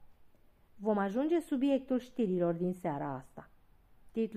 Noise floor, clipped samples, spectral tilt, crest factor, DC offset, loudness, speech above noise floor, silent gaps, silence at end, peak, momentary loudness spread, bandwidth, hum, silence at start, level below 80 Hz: -62 dBFS; under 0.1%; -8 dB/octave; 16 dB; under 0.1%; -34 LUFS; 29 dB; none; 0 s; -20 dBFS; 10 LU; 14 kHz; none; 0 s; -66 dBFS